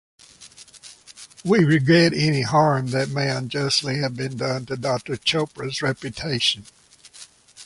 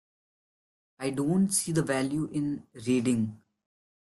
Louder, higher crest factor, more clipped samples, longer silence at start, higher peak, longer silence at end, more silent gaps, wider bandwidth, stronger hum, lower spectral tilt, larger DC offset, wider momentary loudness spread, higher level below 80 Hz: first, -21 LUFS vs -29 LUFS; about the same, 18 dB vs 16 dB; neither; second, 0.4 s vs 1 s; first, -4 dBFS vs -14 dBFS; second, 0 s vs 0.7 s; neither; about the same, 11.5 kHz vs 12.5 kHz; neither; about the same, -5 dB/octave vs -5 dB/octave; neither; first, 25 LU vs 9 LU; first, -56 dBFS vs -64 dBFS